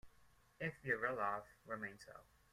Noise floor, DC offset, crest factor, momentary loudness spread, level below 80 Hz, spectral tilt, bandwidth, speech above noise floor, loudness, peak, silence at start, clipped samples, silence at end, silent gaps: -72 dBFS; under 0.1%; 22 dB; 19 LU; -74 dBFS; -6 dB/octave; 16 kHz; 27 dB; -43 LUFS; -24 dBFS; 0.05 s; under 0.1%; 0.3 s; none